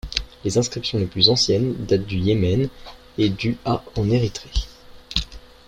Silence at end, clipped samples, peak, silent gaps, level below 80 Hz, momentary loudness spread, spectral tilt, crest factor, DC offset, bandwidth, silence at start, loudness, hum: 0.3 s; under 0.1%; -2 dBFS; none; -36 dBFS; 12 LU; -5 dB/octave; 20 dB; under 0.1%; 13 kHz; 0.05 s; -21 LUFS; none